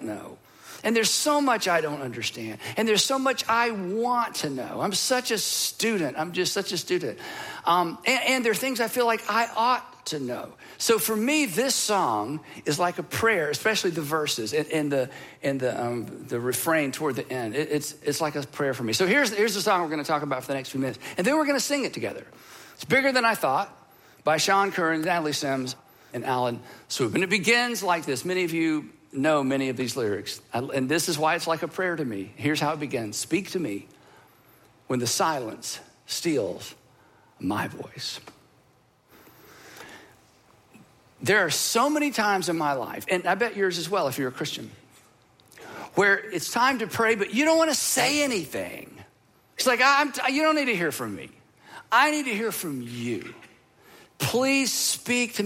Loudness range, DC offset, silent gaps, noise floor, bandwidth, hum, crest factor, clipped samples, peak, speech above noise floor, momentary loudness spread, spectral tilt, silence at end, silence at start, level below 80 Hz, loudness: 6 LU; under 0.1%; none; -62 dBFS; 16.5 kHz; none; 20 dB; under 0.1%; -6 dBFS; 36 dB; 13 LU; -3 dB/octave; 0 s; 0 s; -70 dBFS; -25 LUFS